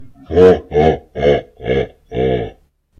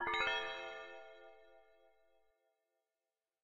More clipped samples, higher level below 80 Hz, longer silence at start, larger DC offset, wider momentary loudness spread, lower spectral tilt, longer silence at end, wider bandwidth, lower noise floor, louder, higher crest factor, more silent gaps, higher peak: first, 0.2% vs under 0.1%; first, -34 dBFS vs -72 dBFS; about the same, 0 s vs 0 s; neither; second, 11 LU vs 24 LU; first, -8 dB/octave vs -2 dB/octave; second, 0.5 s vs 1.85 s; second, 7 kHz vs 15 kHz; second, -46 dBFS vs under -90 dBFS; first, -15 LUFS vs -40 LUFS; second, 16 dB vs 24 dB; neither; first, 0 dBFS vs -22 dBFS